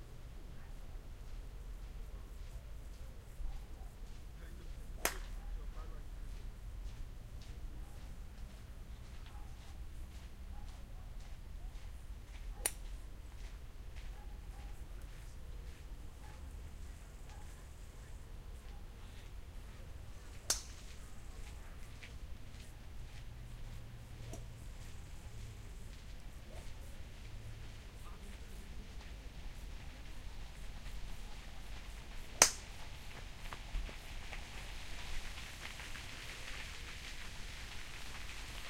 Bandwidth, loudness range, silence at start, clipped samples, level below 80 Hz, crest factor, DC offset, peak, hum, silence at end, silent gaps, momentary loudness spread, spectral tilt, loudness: 16 kHz; 15 LU; 0 s; under 0.1%; -48 dBFS; 40 dB; under 0.1%; -4 dBFS; none; 0 s; none; 7 LU; -2 dB/octave; -47 LUFS